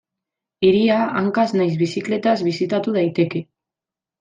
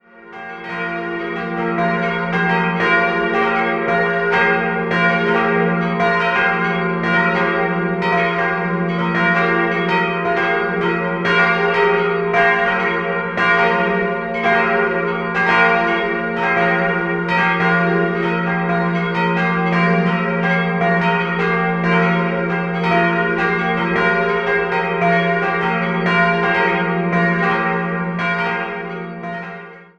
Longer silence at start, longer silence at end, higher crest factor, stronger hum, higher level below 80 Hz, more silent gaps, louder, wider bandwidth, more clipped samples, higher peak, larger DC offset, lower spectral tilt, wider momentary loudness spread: first, 0.6 s vs 0.15 s; first, 0.75 s vs 0.15 s; about the same, 14 dB vs 16 dB; neither; second, -60 dBFS vs -48 dBFS; neither; about the same, -19 LUFS vs -17 LUFS; first, 9.2 kHz vs 6.8 kHz; neither; second, -4 dBFS vs 0 dBFS; neither; about the same, -7 dB/octave vs -7 dB/octave; about the same, 5 LU vs 5 LU